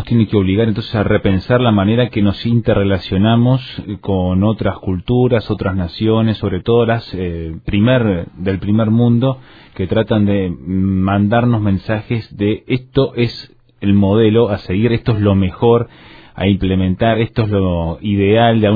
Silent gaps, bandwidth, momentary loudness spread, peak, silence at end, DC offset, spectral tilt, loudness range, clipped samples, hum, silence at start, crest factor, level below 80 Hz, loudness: none; 5 kHz; 7 LU; 0 dBFS; 0 s; under 0.1%; -10 dB/octave; 2 LU; under 0.1%; none; 0 s; 14 dB; -36 dBFS; -15 LUFS